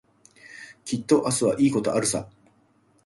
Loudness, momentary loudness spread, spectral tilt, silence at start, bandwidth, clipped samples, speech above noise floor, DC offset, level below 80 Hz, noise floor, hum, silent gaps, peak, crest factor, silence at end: -23 LUFS; 22 LU; -4.5 dB/octave; 0.45 s; 11.5 kHz; under 0.1%; 40 dB; under 0.1%; -60 dBFS; -62 dBFS; none; none; -6 dBFS; 20 dB; 0.8 s